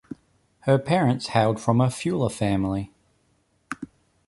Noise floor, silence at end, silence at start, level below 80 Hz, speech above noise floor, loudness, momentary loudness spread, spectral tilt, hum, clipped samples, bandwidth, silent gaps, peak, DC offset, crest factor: -67 dBFS; 0.4 s; 0.1 s; -52 dBFS; 45 dB; -23 LUFS; 19 LU; -6.5 dB/octave; none; under 0.1%; 11.5 kHz; none; -6 dBFS; under 0.1%; 20 dB